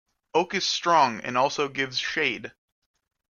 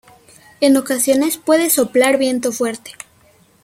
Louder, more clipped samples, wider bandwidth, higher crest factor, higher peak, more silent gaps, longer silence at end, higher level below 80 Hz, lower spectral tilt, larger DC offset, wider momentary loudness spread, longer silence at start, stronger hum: second, -24 LUFS vs -15 LUFS; neither; second, 7.4 kHz vs 16.5 kHz; about the same, 18 dB vs 18 dB; second, -8 dBFS vs 0 dBFS; neither; first, 0.85 s vs 0.7 s; second, -70 dBFS vs -62 dBFS; about the same, -2.5 dB/octave vs -2.5 dB/octave; neither; second, 6 LU vs 12 LU; second, 0.35 s vs 0.6 s; neither